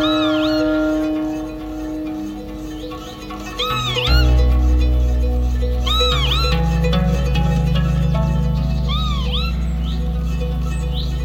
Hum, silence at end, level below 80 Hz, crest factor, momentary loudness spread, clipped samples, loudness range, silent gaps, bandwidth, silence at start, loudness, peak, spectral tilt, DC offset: none; 0 s; -20 dBFS; 14 dB; 12 LU; under 0.1%; 5 LU; none; 15.5 kHz; 0 s; -19 LUFS; -2 dBFS; -6 dB/octave; under 0.1%